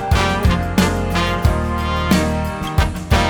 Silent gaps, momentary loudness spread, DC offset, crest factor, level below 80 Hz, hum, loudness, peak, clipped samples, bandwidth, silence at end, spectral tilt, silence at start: none; 4 LU; under 0.1%; 16 dB; -22 dBFS; none; -18 LUFS; 0 dBFS; under 0.1%; over 20 kHz; 0 s; -5.5 dB/octave; 0 s